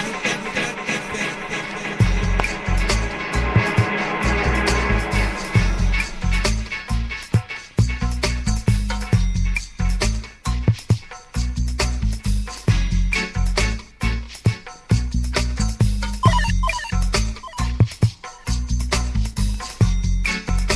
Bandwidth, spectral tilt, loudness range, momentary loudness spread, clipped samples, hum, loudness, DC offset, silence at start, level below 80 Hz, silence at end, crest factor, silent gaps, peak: 12.5 kHz; -5 dB/octave; 3 LU; 6 LU; under 0.1%; none; -22 LUFS; under 0.1%; 0 s; -24 dBFS; 0 s; 20 dB; none; 0 dBFS